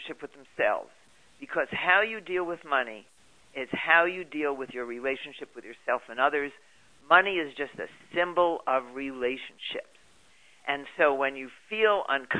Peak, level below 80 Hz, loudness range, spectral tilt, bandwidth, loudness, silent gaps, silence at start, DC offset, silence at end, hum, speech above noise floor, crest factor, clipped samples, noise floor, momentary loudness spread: -4 dBFS; -68 dBFS; 4 LU; -4.5 dB/octave; 11 kHz; -28 LUFS; none; 0 s; under 0.1%; 0 s; none; 32 dB; 24 dB; under 0.1%; -61 dBFS; 18 LU